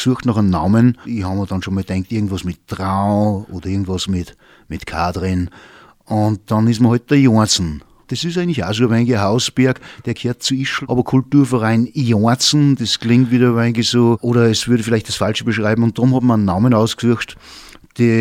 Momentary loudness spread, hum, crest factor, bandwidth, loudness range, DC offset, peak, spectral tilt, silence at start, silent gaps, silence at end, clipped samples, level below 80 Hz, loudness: 11 LU; none; 14 dB; 15.5 kHz; 6 LU; under 0.1%; -2 dBFS; -5.5 dB/octave; 0 s; none; 0 s; under 0.1%; -44 dBFS; -16 LUFS